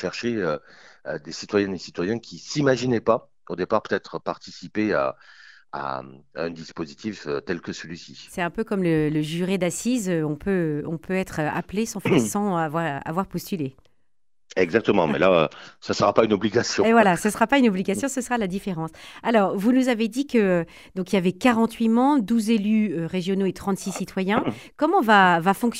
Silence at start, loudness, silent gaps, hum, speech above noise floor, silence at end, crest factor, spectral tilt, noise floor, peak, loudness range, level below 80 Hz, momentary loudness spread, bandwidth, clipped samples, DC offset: 0 s; -23 LUFS; none; none; 58 dB; 0 s; 20 dB; -5.5 dB/octave; -81 dBFS; -4 dBFS; 8 LU; -56 dBFS; 14 LU; 16 kHz; under 0.1%; 0.1%